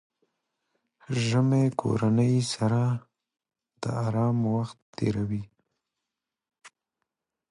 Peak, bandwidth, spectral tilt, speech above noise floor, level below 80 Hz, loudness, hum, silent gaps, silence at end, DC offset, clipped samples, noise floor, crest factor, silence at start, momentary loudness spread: -12 dBFS; 11 kHz; -7 dB/octave; 62 dB; -60 dBFS; -27 LUFS; none; 4.82-4.93 s; 0.8 s; under 0.1%; under 0.1%; -87 dBFS; 18 dB; 1.1 s; 10 LU